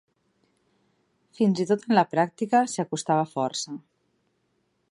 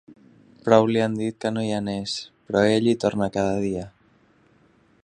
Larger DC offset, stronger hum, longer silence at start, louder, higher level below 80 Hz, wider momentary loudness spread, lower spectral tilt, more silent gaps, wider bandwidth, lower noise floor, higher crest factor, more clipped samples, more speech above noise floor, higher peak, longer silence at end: neither; neither; first, 1.4 s vs 0.1 s; about the same, -25 LUFS vs -23 LUFS; second, -76 dBFS vs -56 dBFS; second, 9 LU vs 12 LU; about the same, -5 dB/octave vs -6 dB/octave; neither; first, 11.5 kHz vs 10 kHz; first, -72 dBFS vs -59 dBFS; about the same, 20 dB vs 22 dB; neither; first, 48 dB vs 37 dB; second, -6 dBFS vs -2 dBFS; about the same, 1.15 s vs 1.15 s